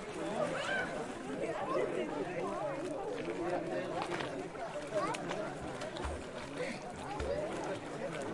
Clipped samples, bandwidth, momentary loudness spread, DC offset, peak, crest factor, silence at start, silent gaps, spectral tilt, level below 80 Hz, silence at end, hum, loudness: under 0.1%; 11.5 kHz; 6 LU; under 0.1%; -20 dBFS; 18 dB; 0 s; none; -5 dB/octave; -56 dBFS; 0 s; none; -39 LUFS